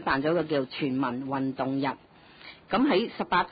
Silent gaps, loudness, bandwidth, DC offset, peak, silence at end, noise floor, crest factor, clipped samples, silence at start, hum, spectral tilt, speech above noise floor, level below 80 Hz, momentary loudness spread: none; -28 LUFS; 5 kHz; under 0.1%; -12 dBFS; 0 s; -50 dBFS; 16 dB; under 0.1%; 0 s; none; -10 dB/octave; 23 dB; -60 dBFS; 19 LU